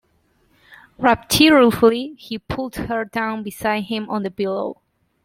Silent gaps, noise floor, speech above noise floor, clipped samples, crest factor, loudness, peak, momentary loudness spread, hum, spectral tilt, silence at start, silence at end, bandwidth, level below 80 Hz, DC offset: none; -62 dBFS; 43 dB; under 0.1%; 18 dB; -19 LUFS; -2 dBFS; 14 LU; none; -4 dB/octave; 0.7 s; 0.5 s; 16.5 kHz; -46 dBFS; under 0.1%